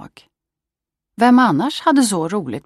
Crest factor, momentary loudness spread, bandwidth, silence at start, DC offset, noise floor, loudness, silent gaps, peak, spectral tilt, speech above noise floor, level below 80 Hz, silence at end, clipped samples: 14 dB; 8 LU; 13 kHz; 0 s; under 0.1%; -85 dBFS; -15 LUFS; none; -2 dBFS; -4.5 dB/octave; 70 dB; -64 dBFS; 0.05 s; under 0.1%